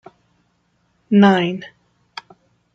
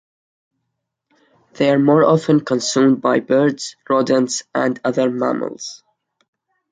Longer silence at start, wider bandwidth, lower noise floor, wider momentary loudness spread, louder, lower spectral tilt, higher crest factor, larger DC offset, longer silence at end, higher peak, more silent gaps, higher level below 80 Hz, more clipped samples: second, 1.1 s vs 1.55 s; second, 6.6 kHz vs 9.4 kHz; second, -64 dBFS vs -76 dBFS; first, 24 LU vs 10 LU; about the same, -15 LUFS vs -17 LUFS; first, -7.5 dB/octave vs -5 dB/octave; about the same, 18 dB vs 16 dB; neither; first, 1.1 s vs 0.95 s; about the same, -2 dBFS vs -2 dBFS; neither; about the same, -62 dBFS vs -64 dBFS; neither